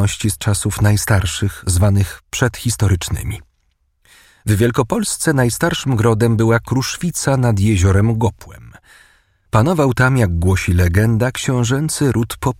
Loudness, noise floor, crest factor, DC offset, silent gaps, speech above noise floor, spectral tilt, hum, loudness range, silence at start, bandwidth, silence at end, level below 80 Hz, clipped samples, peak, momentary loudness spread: -16 LUFS; -63 dBFS; 16 dB; under 0.1%; none; 47 dB; -5.5 dB/octave; none; 3 LU; 0 s; 16 kHz; 0.05 s; -34 dBFS; under 0.1%; 0 dBFS; 6 LU